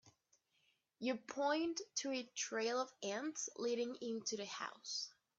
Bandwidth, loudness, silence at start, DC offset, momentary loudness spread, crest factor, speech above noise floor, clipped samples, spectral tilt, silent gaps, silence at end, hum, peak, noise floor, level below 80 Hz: 8 kHz; -42 LUFS; 0.05 s; under 0.1%; 5 LU; 18 dB; 38 dB; under 0.1%; -2 dB/octave; none; 0.3 s; none; -24 dBFS; -80 dBFS; -88 dBFS